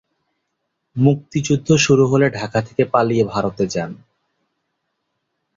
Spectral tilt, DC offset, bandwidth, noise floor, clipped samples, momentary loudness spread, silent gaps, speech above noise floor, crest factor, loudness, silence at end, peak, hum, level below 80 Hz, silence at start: -5.5 dB/octave; under 0.1%; 7.8 kHz; -74 dBFS; under 0.1%; 9 LU; none; 58 dB; 18 dB; -17 LUFS; 1.65 s; -2 dBFS; none; -52 dBFS; 0.95 s